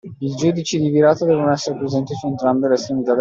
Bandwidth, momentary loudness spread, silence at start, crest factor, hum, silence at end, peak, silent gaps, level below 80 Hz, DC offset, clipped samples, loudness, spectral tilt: 7.8 kHz; 7 LU; 0.05 s; 14 dB; none; 0 s; -2 dBFS; none; -58 dBFS; under 0.1%; under 0.1%; -18 LUFS; -6 dB/octave